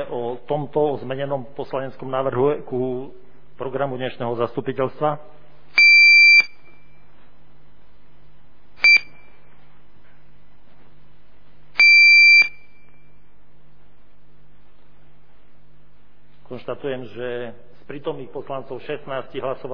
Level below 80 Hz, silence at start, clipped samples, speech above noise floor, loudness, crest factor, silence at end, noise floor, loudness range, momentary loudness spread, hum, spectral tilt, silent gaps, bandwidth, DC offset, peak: -60 dBFS; 0 s; under 0.1%; 30 dB; -14 LUFS; 16 dB; 0 s; -56 dBFS; 19 LU; 24 LU; none; -3.5 dB/octave; none; 5.2 kHz; 2%; -4 dBFS